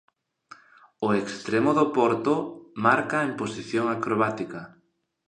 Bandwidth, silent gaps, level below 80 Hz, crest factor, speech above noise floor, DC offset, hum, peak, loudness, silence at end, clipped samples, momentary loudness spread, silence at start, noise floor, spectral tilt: 10 kHz; none; -68 dBFS; 20 dB; 28 dB; under 0.1%; none; -6 dBFS; -25 LUFS; 0.6 s; under 0.1%; 11 LU; 1 s; -52 dBFS; -6 dB/octave